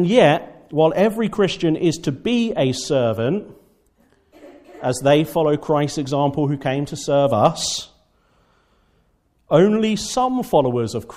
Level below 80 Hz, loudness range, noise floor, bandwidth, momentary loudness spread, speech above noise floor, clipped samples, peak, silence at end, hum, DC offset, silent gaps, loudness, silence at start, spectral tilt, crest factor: -52 dBFS; 3 LU; -62 dBFS; 15.5 kHz; 8 LU; 44 dB; under 0.1%; -2 dBFS; 0 s; none; under 0.1%; none; -19 LUFS; 0 s; -5.5 dB/octave; 18 dB